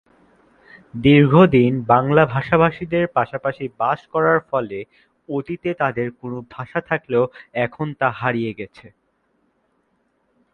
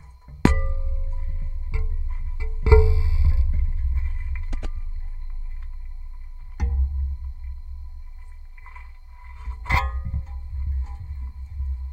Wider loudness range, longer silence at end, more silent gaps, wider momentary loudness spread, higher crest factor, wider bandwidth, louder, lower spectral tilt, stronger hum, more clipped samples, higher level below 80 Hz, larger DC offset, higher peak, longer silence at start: about the same, 8 LU vs 8 LU; first, 1.85 s vs 0 s; neither; second, 17 LU vs 21 LU; about the same, 20 dB vs 24 dB; second, 4.7 kHz vs 7.8 kHz; first, -19 LUFS vs -26 LUFS; first, -9.5 dB/octave vs -7.5 dB/octave; neither; neither; second, -50 dBFS vs -24 dBFS; neither; about the same, 0 dBFS vs 0 dBFS; first, 0.95 s vs 0.05 s